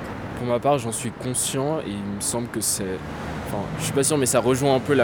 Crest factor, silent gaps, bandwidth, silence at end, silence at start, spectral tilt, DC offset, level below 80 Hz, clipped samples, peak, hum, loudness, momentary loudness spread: 18 dB; none; over 20 kHz; 0 s; 0 s; -4 dB/octave; under 0.1%; -46 dBFS; under 0.1%; -6 dBFS; none; -24 LUFS; 10 LU